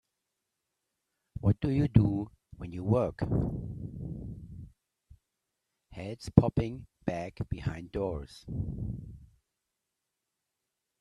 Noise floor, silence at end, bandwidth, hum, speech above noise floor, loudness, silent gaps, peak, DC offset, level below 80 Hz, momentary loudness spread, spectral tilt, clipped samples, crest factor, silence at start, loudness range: -86 dBFS; 1.75 s; 10.5 kHz; none; 56 dB; -32 LUFS; none; -4 dBFS; under 0.1%; -48 dBFS; 19 LU; -9 dB/octave; under 0.1%; 30 dB; 1.35 s; 9 LU